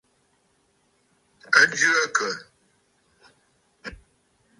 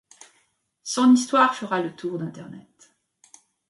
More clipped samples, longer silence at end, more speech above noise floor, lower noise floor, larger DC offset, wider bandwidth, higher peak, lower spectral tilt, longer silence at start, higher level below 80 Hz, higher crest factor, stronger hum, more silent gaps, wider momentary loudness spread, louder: neither; second, 0.65 s vs 1.1 s; about the same, 46 dB vs 46 dB; about the same, -67 dBFS vs -68 dBFS; neither; about the same, 11.5 kHz vs 11.5 kHz; first, -2 dBFS vs -6 dBFS; second, -0.5 dB/octave vs -4 dB/octave; first, 1.5 s vs 0.85 s; first, -60 dBFS vs -74 dBFS; first, 26 dB vs 20 dB; neither; neither; about the same, 24 LU vs 22 LU; about the same, -20 LUFS vs -21 LUFS